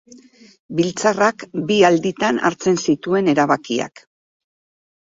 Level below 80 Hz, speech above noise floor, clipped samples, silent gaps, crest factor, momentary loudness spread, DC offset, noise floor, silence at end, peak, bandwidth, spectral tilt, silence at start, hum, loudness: -60 dBFS; 28 dB; under 0.1%; none; 18 dB; 9 LU; under 0.1%; -46 dBFS; 1.25 s; -2 dBFS; 7.8 kHz; -5 dB/octave; 0.7 s; none; -18 LUFS